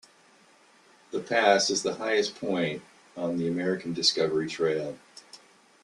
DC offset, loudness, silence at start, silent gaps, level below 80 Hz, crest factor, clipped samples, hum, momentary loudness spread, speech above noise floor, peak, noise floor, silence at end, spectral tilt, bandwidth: under 0.1%; -27 LUFS; 1.1 s; none; -72 dBFS; 22 dB; under 0.1%; none; 17 LU; 32 dB; -6 dBFS; -59 dBFS; 0.45 s; -3.5 dB/octave; 11.5 kHz